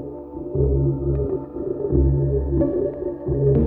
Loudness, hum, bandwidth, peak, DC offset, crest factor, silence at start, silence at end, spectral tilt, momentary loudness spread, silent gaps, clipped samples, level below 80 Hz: -22 LUFS; none; 2 kHz; -6 dBFS; under 0.1%; 14 dB; 0 s; 0 s; -14.5 dB/octave; 9 LU; none; under 0.1%; -28 dBFS